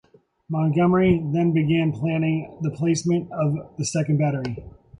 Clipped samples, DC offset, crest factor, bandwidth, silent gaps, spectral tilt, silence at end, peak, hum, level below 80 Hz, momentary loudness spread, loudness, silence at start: under 0.1%; under 0.1%; 16 dB; 10.5 kHz; none; -7 dB/octave; 0.3 s; -6 dBFS; none; -50 dBFS; 9 LU; -22 LUFS; 0.5 s